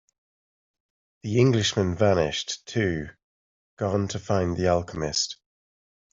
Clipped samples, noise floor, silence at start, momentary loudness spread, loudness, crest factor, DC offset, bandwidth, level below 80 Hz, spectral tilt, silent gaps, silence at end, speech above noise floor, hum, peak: under 0.1%; under -90 dBFS; 1.25 s; 10 LU; -25 LUFS; 20 dB; under 0.1%; 7.8 kHz; -54 dBFS; -5 dB/octave; 3.24-3.77 s; 0.8 s; over 66 dB; none; -6 dBFS